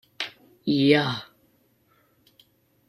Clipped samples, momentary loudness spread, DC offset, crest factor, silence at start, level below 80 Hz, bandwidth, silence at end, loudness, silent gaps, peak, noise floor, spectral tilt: under 0.1%; 15 LU; under 0.1%; 22 dB; 0.2 s; -68 dBFS; 12.5 kHz; 1.65 s; -24 LUFS; none; -6 dBFS; -64 dBFS; -6.5 dB/octave